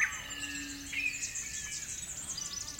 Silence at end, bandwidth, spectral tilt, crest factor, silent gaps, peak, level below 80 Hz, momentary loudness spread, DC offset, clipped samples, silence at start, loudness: 0 s; 16.5 kHz; 0 dB/octave; 22 dB; none; -16 dBFS; -58 dBFS; 5 LU; under 0.1%; under 0.1%; 0 s; -36 LUFS